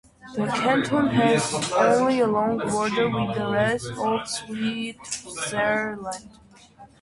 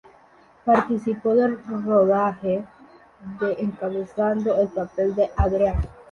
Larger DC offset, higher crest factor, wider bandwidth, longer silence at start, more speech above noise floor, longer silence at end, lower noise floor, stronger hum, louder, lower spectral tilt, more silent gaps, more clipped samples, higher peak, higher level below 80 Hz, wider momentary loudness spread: neither; about the same, 16 dB vs 16 dB; first, 11.5 kHz vs 7 kHz; second, 0.25 s vs 0.65 s; second, 26 dB vs 32 dB; about the same, 0.15 s vs 0.1 s; second, -50 dBFS vs -54 dBFS; neither; about the same, -23 LUFS vs -23 LUFS; second, -4.5 dB/octave vs -9 dB/octave; neither; neither; about the same, -8 dBFS vs -6 dBFS; second, -56 dBFS vs -36 dBFS; first, 12 LU vs 9 LU